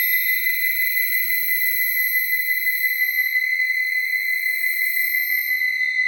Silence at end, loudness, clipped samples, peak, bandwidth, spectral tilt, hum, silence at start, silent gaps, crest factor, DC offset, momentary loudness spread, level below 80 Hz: 0 s; -18 LUFS; under 0.1%; -8 dBFS; over 20 kHz; 7 dB/octave; none; 0 s; none; 12 dB; under 0.1%; 2 LU; under -90 dBFS